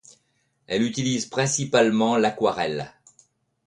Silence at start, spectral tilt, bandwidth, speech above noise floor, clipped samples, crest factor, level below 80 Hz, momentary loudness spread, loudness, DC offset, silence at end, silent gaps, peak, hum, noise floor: 0.7 s; -4 dB/octave; 11.5 kHz; 47 dB; under 0.1%; 18 dB; -62 dBFS; 9 LU; -23 LUFS; under 0.1%; 0.8 s; none; -6 dBFS; none; -70 dBFS